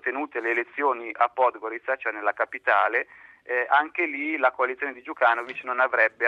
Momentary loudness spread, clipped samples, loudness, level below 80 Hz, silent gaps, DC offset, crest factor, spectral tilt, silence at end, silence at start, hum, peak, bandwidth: 7 LU; under 0.1%; -25 LUFS; -76 dBFS; none; under 0.1%; 18 dB; -4 dB/octave; 0 s; 0.05 s; none; -6 dBFS; 7.4 kHz